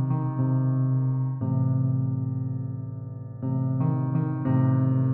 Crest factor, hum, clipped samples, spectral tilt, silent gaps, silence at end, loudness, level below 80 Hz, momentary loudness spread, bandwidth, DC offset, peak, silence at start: 12 dB; none; under 0.1%; -12.5 dB/octave; none; 0 s; -26 LUFS; -60 dBFS; 10 LU; 2 kHz; under 0.1%; -12 dBFS; 0 s